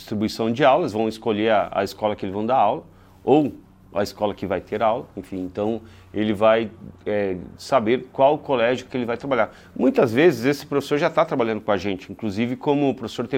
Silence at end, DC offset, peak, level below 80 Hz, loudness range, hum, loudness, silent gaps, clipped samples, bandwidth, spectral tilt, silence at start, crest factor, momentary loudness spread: 0 s; under 0.1%; -2 dBFS; -56 dBFS; 3 LU; none; -22 LUFS; none; under 0.1%; 16.5 kHz; -6.5 dB/octave; 0 s; 18 dB; 11 LU